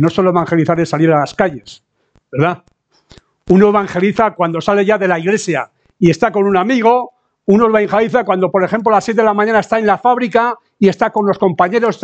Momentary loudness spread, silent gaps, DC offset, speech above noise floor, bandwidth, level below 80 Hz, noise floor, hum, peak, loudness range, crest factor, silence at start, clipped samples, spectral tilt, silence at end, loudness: 6 LU; none; under 0.1%; 34 dB; 8.8 kHz; -50 dBFS; -47 dBFS; none; 0 dBFS; 3 LU; 14 dB; 0 s; under 0.1%; -6.5 dB/octave; 0.1 s; -13 LUFS